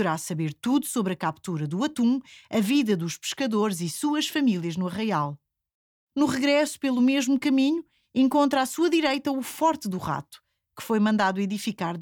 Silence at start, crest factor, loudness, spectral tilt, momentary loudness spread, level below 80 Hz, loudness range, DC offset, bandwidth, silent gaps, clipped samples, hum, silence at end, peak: 0 s; 14 dB; -25 LUFS; -5 dB/octave; 8 LU; -66 dBFS; 3 LU; under 0.1%; 19 kHz; 5.74-6.07 s; under 0.1%; none; 0 s; -10 dBFS